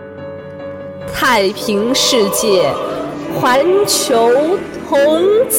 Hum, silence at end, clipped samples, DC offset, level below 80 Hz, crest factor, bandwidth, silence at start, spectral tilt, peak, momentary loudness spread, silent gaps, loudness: none; 0 s; under 0.1%; under 0.1%; -48 dBFS; 14 dB; 17 kHz; 0 s; -3 dB/octave; 0 dBFS; 16 LU; none; -13 LUFS